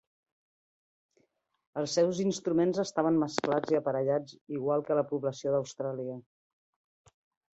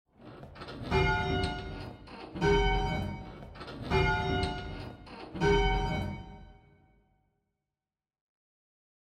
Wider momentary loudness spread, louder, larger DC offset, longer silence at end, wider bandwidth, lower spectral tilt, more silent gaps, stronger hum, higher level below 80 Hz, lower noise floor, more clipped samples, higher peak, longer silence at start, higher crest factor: second, 9 LU vs 19 LU; about the same, -30 LUFS vs -31 LUFS; neither; second, 1.35 s vs 2.5 s; second, 8.2 kHz vs 9.8 kHz; about the same, -5.5 dB/octave vs -6 dB/octave; first, 4.41-4.47 s vs none; neither; second, -74 dBFS vs -40 dBFS; second, -73 dBFS vs under -90 dBFS; neither; first, -10 dBFS vs -14 dBFS; first, 1.75 s vs 0.2 s; about the same, 22 dB vs 18 dB